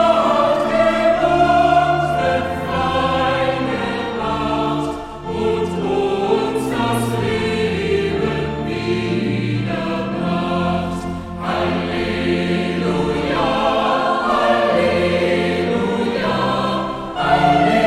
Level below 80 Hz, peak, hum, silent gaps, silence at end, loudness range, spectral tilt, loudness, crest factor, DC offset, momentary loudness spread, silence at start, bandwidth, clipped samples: -40 dBFS; -2 dBFS; none; none; 0 s; 4 LU; -6 dB/octave; -18 LUFS; 14 dB; 0.2%; 7 LU; 0 s; 15 kHz; under 0.1%